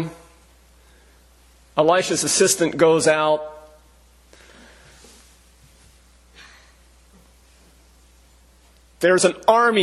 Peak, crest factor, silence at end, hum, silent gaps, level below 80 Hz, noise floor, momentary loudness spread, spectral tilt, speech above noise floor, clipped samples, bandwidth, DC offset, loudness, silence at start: 0 dBFS; 22 dB; 0 s; none; none; -54 dBFS; -53 dBFS; 9 LU; -3 dB/octave; 36 dB; under 0.1%; 13 kHz; under 0.1%; -18 LUFS; 0 s